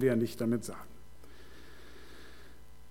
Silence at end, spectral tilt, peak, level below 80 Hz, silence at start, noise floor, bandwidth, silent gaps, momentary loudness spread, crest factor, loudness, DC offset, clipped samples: 0.4 s; -6.5 dB/octave; -16 dBFS; -58 dBFS; 0 s; -56 dBFS; 16.5 kHz; none; 25 LU; 22 dB; -33 LUFS; 0.5%; under 0.1%